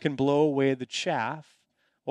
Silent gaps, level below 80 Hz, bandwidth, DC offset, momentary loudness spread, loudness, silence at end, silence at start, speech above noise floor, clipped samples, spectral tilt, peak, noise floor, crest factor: none; -70 dBFS; 11 kHz; under 0.1%; 14 LU; -26 LUFS; 0 s; 0 s; 45 dB; under 0.1%; -5.5 dB/octave; -12 dBFS; -72 dBFS; 16 dB